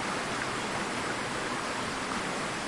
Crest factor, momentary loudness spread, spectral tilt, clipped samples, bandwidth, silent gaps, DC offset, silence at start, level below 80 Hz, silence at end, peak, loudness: 14 dB; 1 LU; -3 dB/octave; under 0.1%; 11.5 kHz; none; under 0.1%; 0 s; -58 dBFS; 0 s; -18 dBFS; -32 LUFS